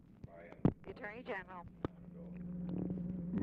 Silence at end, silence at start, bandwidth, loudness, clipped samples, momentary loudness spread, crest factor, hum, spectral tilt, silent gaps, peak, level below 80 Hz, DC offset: 0 s; 0 s; 4.8 kHz; -43 LUFS; under 0.1%; 16 LU; 22 dB; none; -10 dB/octave; none; -18 dBFS; -58 dBFS; under 0.1%